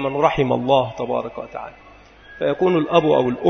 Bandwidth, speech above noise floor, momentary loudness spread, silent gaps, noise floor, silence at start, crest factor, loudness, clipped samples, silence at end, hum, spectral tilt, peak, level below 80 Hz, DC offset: 6.6 kHz; 26 dB; 16 LU; none; -44 dBFS; 0 s; 20 dB; -19 LUFS; under 0.1%; 0 s; none; -7 dB/octave; 0 dBFS; -48 dBFS; under 0.1%